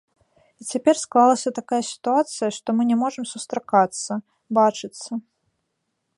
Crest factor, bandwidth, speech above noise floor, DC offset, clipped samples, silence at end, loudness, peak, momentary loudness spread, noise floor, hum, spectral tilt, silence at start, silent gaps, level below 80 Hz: 20 dB; 11.5 kHz; 55 dB; under 0.1%; under 0.1%; 0.95 s; -22 LUFS; -4 dBFS; 14 LU; -76 dBFS; none; -4 dB/octave; 0.6 s; none; -72 dBFS